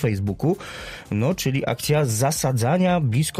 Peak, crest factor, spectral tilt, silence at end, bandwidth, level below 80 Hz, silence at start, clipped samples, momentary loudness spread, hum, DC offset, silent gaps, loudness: -10 dBFS; 12 dB; -5.5 dB/octave; 0 s; 16 kHz; -48 dBFS; 0 s; under 0.1%; 9 LU; none; under 0.1%; none; -22 LUFS